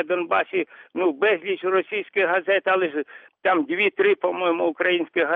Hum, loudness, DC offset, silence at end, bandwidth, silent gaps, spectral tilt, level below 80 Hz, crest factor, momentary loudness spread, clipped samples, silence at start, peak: none; -22 LUFS; under 0.1%; 0 s; 4.1 kHz; none; -7 dB/octave; -78 dBFS; 14 dB; 7 LU; under 0.1%; 0 s; -8 dBFS